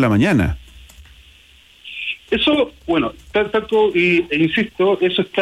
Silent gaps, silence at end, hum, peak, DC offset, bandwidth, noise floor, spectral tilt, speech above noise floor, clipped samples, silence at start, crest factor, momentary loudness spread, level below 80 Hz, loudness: none; 0 s; none; -6 dBFS; under 0.1%; 13.5 kHz; -48 dBFS; -6.5 dB/octave; 32 dB; under 0.1%; 0 s; 14 dB; 11 LU; -40 dBFS; -17 LUFS